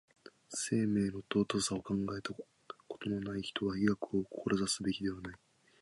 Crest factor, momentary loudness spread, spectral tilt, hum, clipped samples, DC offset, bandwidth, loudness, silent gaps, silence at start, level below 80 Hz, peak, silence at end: 18 dB; 14 LU; -4.5 dB/octave; none; under 0.1%; under 0.1%; 11.5 kHz; -36 LUFS; none; 0.5 s; -62 dBFS; -18 dBFS; 0.45 s